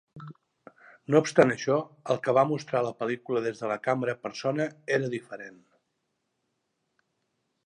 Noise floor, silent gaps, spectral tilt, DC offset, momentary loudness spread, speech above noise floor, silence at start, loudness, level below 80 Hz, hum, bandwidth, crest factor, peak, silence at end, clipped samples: -79 dBFS; none; -6 dB/octave; under 0.1%; 20 LU; 52 dB; 0.15 s; -27 LUFS; -76 dBFS; none; 10.5 kHz; 24 dB; -4 dBFS; 2.15 s; under 0.1%